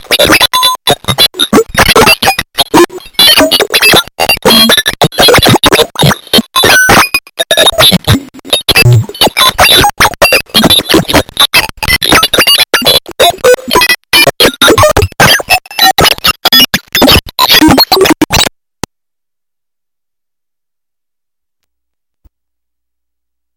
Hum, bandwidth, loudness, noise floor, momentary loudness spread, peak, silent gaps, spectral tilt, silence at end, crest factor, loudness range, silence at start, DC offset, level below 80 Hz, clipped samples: none; over 20 kHz; -5 LUFS; -85 dBFS; 7 LU; 0 dBFS; none; -3 dB/octave; 5.1 s; 8 dB; 2 LU; 0.1 s; 0.3%; -28 dBFS; 4%